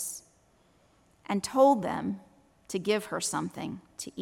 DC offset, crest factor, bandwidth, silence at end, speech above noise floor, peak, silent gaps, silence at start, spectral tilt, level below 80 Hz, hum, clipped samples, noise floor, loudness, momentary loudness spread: under 0.1%; 20 dB; 16.5 kHz; 0 s; 36 dB; -12 dBFS; none; 0 s; -4 dB/octave; -68 dBFS; none; under 0.1%; -65 dBFS; -29 LUFS; 18 LU